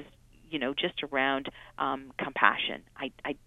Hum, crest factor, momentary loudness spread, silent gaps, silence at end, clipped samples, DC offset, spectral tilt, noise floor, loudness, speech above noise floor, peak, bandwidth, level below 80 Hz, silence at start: none; 28 dB; 13 LU; none; 0.1 s; under 0.1%; under 0.1%; -5.5 dB/octave; -54 dBFS; -30 LUFS; 23 dB; -4 dBFS; 12.5 kHz; -62 dBFS; 0 s